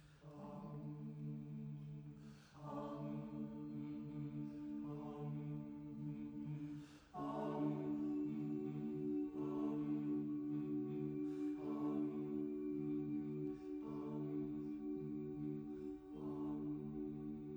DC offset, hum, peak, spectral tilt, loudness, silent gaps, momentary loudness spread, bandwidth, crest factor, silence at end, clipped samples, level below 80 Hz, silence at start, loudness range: under 0.1%; none; -30 dBFS; -9.5 dB/octave; -46 LUFS; none; 9 LU; over 20 kHz; 16 dB; 0 s; under 0.1%; -72 dBFS; 0 s; 6 LU